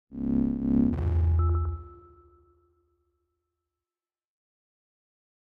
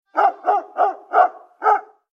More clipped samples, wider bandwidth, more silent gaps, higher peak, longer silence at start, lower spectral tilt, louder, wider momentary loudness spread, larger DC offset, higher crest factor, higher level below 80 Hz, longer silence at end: neither; second, 2.7 kHz vs 6.6 kHz; neither; second, -14 dBFS vs -2 dBFS; about the same, 0.1 s vs 0.15 s; first, -12 dB/octave vs -2.5 dB/octave; second, -27 LUFS vs -19 LUFS; first, 7 LU vs 4 LU; neither; about the same, 16 dB vs 16 dB; first, -36 dBFS vs under -90 dBFS; first, 3.5 s vs 0.3 s